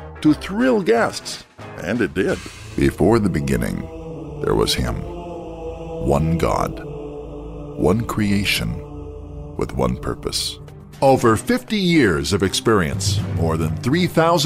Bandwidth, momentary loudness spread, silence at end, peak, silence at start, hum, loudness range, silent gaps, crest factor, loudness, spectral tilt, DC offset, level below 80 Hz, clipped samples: 16 kHz; 16 LU; 0 s; -4 dBFS; 0 s; none; 5 LU; none; 16 dB; -20 LUFS; -5.5 dB/octave; under 0.1%; -36 dBFS; under 0.1%